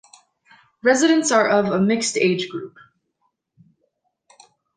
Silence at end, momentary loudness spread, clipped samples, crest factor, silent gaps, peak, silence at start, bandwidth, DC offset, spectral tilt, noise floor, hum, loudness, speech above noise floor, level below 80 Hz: 2.1 s; 13 LU; under 0.1%; 18 dB; none; -4 dBFS; 0.85 s; 10 kHz; under 0.1%; -4 dB/octave; -72 dBFS; none; -18 LUFS; 53 dB; -66 dBFS